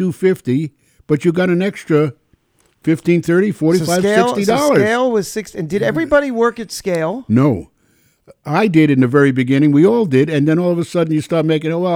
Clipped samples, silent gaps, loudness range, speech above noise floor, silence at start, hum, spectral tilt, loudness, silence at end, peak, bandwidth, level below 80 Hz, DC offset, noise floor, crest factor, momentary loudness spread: under 0.1%; none; 4 LU; 44 dB; 0 s; none; -6.5 dB/octave; -15 LUFS; 0 s; 0 dBFS; 16.5 kHz; -50 dBFS; under 0.1%; -58 dBFS; 14 dB; 8 LU